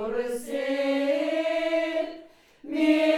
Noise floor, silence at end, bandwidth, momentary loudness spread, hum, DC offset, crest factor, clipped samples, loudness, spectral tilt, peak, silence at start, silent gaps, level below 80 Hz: -49 dBFS; 0 s; 15 kHz; 11 LU; none; under 0.1%; 16 dB; under 0.1%; -27 LUFS; -3.5 dB/octave; -10 dBFS; 0 s; none; -64 dBFS